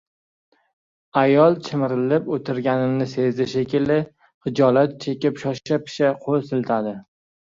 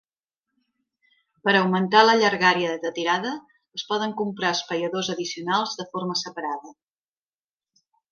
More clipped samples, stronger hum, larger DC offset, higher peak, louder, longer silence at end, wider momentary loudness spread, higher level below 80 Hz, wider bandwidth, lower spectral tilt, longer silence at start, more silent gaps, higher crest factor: neither; neither; neither; about the same, -2 dBFS vs -2 dBFS; about the same, -21 LUFS vs -23 LUFS; second, 0.4 s vs 1.4 s; second, 8 LU vs 14 LU; first, -62 dBFS vs -74 dBFS; about the same, 7.6 kHz vs 7.2 kHz; first, -7.5 dB/octave vs -4 dB/octave; second, 1.15 s vs 1.45 s; first, 4.34-4.41 s vs none; second, 18 dB vs 24 dB